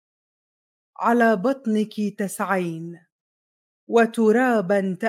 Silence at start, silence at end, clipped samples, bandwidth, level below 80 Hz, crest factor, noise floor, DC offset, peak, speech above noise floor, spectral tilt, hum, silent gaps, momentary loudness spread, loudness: 1 s; 0 s; under 0.1%; 16 kHz; -80 dBFS; 18 dB; under -90 dBFS; under 0.1%; -6 dBFS; over 69 dB; -6 dB/octave; none; 3.12-3.87 s; 9 LU; -21 LUFS